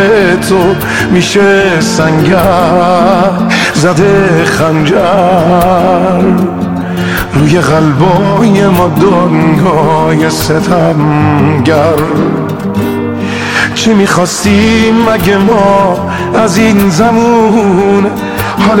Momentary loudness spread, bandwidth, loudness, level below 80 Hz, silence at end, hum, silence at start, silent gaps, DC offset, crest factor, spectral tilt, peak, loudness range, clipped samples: 6 LU; 18 kHz; -8 LUFS; -32 dBFS; 0 s; none; 0 s; none; 0.9%; 8 dB; -6 dB/octave; 0 dBFS; 2 LU; 0.2%